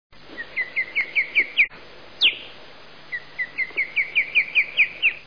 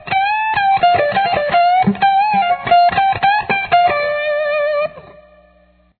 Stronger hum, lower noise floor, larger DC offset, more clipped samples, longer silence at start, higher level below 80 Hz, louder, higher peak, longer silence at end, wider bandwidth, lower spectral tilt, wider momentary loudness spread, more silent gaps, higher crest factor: neither; second, -46 dBFS vs -52 dBFS; first, 0.5% vs under 0.1%; neither; first, 0.3 s vs 0 s; second, -62 dBFS vs -48 dBFS; second, -20 LUFS vs -14 LUFS; second, -8 dBFS vs -2 dBFS; second, 0.05 s vs 0.85 s; first, 5.4 kHz vs 4.5 kHz; second, -1.5 dB/octave vs -8 dB/octave; first, 15 LU vs 5 LU; neither; about the same, 16 dB vs 12 dB